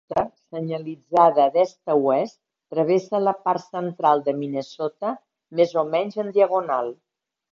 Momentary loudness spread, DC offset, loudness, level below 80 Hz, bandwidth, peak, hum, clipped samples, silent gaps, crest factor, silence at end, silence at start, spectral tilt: 12 LU; under 0.1%; -22 LUFS; -68 dBFS; 7.4 kHz; -4 dBFS; none; under 0.1%; none; 20 dB; 0.6 s; 0.1 s; -7 dB/octave